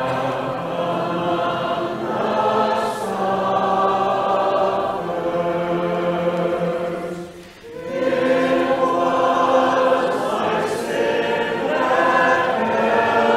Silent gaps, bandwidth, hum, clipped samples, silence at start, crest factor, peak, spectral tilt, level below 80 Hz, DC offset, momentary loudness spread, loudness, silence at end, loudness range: none; 14.5 kHz; none; under 0.1%; 0 s; 16 dB; -4 dBFS; -5.5 dB/octave; -56 dBFS; under 0.1%; 7 LU; -20 LUFS; 0 s; 3 LU